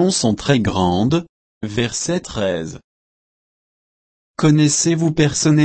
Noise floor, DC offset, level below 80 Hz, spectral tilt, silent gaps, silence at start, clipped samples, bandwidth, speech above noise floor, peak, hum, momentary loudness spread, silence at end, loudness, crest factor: under -90 dBFS; under 0.1%; -44 dBFS; -5 dB/octave; 1.29-1.61 s, 2.84-4.34 s; 0 s; under 0.1%; 8.8 kHz; over 74 dB; -2 dBFS; none; 11 LU; 0 s; -17 LUFS; 16 dB